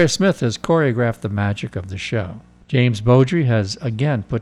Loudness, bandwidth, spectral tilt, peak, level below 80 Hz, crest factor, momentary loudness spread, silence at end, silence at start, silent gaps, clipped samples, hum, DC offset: -19 LUFS; 12 kHz; -6 dB/octave; -4 dBFS; -46 dBFS; 14 dB; 10 LU; 0 s; 0 s; none; under 0.1%; none; under 0.1%